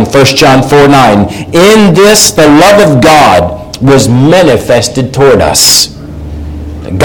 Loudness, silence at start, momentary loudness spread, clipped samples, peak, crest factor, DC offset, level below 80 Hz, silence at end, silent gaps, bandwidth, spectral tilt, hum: -4 LUFS; 0 s; 16 LU; 8%; 0 dBFS; 4 dB; 1%; -26 dBFS; 0 s; none; over 20 kHz; -4 dB/octave; none